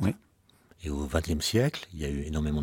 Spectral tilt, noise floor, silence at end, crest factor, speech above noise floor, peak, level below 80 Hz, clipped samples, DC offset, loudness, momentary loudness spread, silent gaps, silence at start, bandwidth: -5.5 dB/octave; -63 dBFS; 0 s; 20 dB; 34 dB; -10 dBFS; -40 dBFS; under 0.1%; under 0.1%; -30 LUFS; 11 LU; none; 0 s; 17 kHz